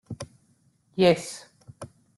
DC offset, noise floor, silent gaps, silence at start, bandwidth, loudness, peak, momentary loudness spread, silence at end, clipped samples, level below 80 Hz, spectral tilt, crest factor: under 0.1%; -65 dBFS; none; 0.1 s; 12.5 kHz; -23 LUFS; -6 dBFS; 24 LU; 0.35 s; under 0.1%; -64 dBFS; -5.5 dB/octave; 22 dB